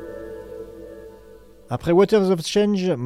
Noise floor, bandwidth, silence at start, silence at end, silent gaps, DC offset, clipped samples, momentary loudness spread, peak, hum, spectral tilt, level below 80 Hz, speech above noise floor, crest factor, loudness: -46 dBFS; 15 kHz; 0 s; 0 s; none; under 0.1%; under 0.1%; 23 LU; -6 dBFS; none; -6 dB/octave; -50 dBFS; 27 dB; 16 dB; -19 LUFS